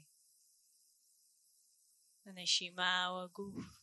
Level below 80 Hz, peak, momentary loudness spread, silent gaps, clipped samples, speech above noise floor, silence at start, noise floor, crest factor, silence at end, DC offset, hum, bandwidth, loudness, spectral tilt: -78 dBFS; -18 dBFS; 14 LU; none; under 0.1%; 34 dB; 2.25 s; -73 dBFS; 24 dB; 0.05 s; under 0.1%; none; 12 kHz; -37 LUFS; -1 dB/octave